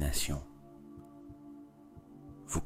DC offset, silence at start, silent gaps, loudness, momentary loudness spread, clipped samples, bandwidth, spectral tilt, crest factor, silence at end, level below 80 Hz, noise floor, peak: under 0.1%; 0 s; none; -41 LUFS; 20 LU; under 0.1%; 16 kHz; -4 dB/octave; 20 dB; 0 s; -44 dBFS; -55 dBFS; -18 dBFS